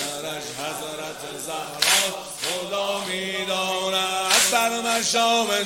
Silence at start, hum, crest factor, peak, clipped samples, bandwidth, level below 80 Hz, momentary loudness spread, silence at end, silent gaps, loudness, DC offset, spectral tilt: 0 s; none; 22 dB; -2 dBFS; under 0.1%; 16.5 kHz; -62 dBFS; 12 LU; 0 s; none; -22 LUFS; under 0.1%; -0.5 dB/octave